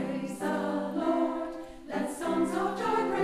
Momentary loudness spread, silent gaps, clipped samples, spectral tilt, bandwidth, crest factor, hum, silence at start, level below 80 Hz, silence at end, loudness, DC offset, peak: 8 LU; none; under 0.1%; -5.5 dB/octave; 15 kHz; 14 dB; none; 0 s; -60 dBFS; 0 s; -31 LUFS; under 0.1%; -16 dBFS